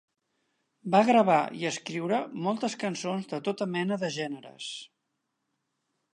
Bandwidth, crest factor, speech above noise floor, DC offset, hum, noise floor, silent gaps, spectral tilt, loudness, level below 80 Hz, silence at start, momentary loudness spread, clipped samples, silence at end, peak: 11 kHz; 20 dB; 53 dB; under 0.1%; none; -81 dBFS; none; -5 dB/octave; -28 LUFS; -82 dBFS; 0.85 s; 17 LU; under 0.1%; 1.3 s; -10 dBFS